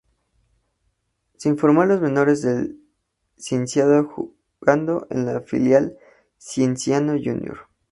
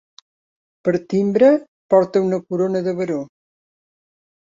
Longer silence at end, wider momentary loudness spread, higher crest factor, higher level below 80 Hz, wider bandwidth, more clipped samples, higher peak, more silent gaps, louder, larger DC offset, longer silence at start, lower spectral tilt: second, 0.3 s vs 1.15 s; first, 13 LU vs 10 LU; about the same, 20 dB vs 18 dB; first, -58 dBFS vs -64 dBFS; first, 11.5 kHz vs 7.6 kHz; neither; about the same, 0 dBFS vs -2 dBFS; second, none vs 1.68-1.89 s; about the same, -20 LUFS vs -19 LUFS; neither; first, 1.4 s vs 0.85 s; second, -6.5 dB/octave vs -8 dB/octave